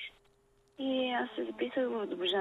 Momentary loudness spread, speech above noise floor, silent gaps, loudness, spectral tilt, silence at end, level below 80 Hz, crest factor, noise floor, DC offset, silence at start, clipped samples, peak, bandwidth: 6 LU; 34 dB; none; -34 LUFS; -5 dB/octave; 0 s; -76 dBFS; 14 dB; -68 dBFS; under 0.1%; 0 s; under 0.1%; -22 dBFS; 10.5 kHz